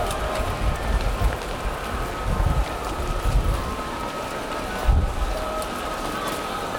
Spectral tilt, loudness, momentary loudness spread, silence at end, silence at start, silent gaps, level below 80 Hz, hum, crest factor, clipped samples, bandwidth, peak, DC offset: -5 dB/octave; -26 LUFS; 5 LU; 0 s; 0 s; none; -26 dBFS; none; 16 dB; under 0.1%; 19.5 kHz; -8 dBFS; under 0.1%